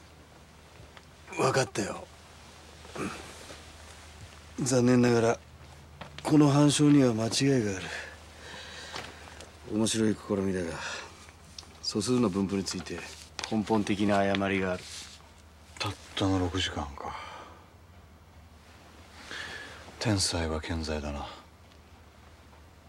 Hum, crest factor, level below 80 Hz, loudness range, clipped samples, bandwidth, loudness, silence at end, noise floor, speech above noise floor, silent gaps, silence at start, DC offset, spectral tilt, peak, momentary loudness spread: none; 20 dB; -54 dBFS; 9 LU; under 0.1%; 14 kHz; -29 LUFS; 0.25 s; -54 dBFS; 27 dB; none; 0.2 s; under 0.1%; -5 dB/octave; -10 dBFS; 25 LU